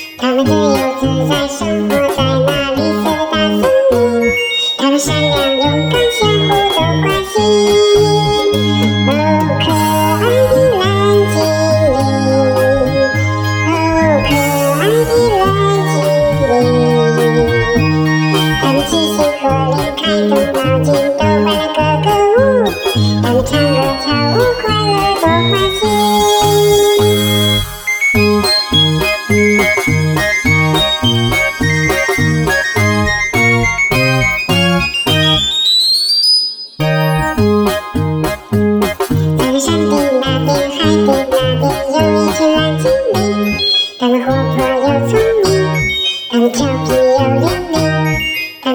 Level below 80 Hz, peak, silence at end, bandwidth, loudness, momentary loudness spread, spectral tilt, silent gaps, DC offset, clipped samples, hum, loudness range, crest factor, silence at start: -34 dBFS; 0 dBFS; 0 s; over 20 kHz; -12 LUFS; 4 LU; -5 dB/octave; none; under 0.1%; under 0.1%; none; 2 LU; 12 dB; 0 s